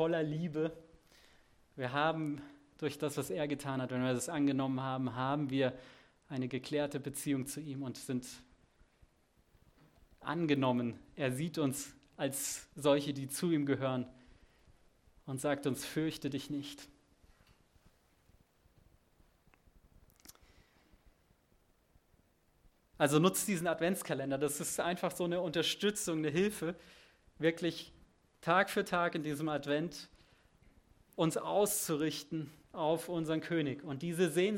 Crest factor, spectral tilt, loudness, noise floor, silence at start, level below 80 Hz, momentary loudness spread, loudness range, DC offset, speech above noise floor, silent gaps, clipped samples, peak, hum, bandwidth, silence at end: 24 dB; -4.5 dB/octave; -35 LUFS; -71 dBFS; 0 s; -68 dBFS; 11 LU; 6 LU; under 0.1%; 36 dB; none; under 0.1%; -14 dBFS; none; 17 kHz; 0 s